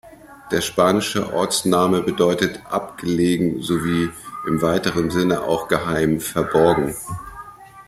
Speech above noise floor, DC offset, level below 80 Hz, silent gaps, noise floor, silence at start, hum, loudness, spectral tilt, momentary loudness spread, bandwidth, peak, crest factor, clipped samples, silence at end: 20 dB; under 0.1%; -48 dBFS; none; -40 dBFS; 0.05 s; none; -20 LUFS; -5 dB/octave; 9 LU; 16 kHz; -2 dBFS; 18 dB; under 0.1%; 0.05 s